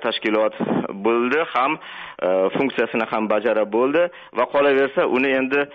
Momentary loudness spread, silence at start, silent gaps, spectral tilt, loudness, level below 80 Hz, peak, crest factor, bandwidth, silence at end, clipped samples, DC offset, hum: 5 LU; 0 s; none; -3 dB/octave; -20 LUFS; -64 dBFS; -8 dBFS; 12 dB; 6 kHz; 0 s; under 0.1%; under 0.1%; none